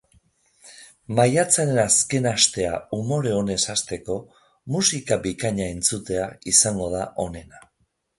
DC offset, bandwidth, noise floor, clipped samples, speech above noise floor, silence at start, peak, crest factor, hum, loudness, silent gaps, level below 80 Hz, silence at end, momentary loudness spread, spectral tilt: under 0.1%; 12 kHz; -70 dBFS; under 0.1%; 48 dB; 0.65 s; -2 dBFS; 22 dB; none; -21 LUFS; none; -50 dBFS; 0.6 s; 12 LU; -3 dB/octave